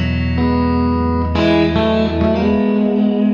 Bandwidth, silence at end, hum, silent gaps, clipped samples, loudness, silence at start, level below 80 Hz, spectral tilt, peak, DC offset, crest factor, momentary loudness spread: 7 kHz; 0 s; none; none; under 0.1%; -15 LUFS; 0 s; -28 dBFS; -8.5 dB/octave; -2 dBFS; under 0.1%; 12 dB; 3 LU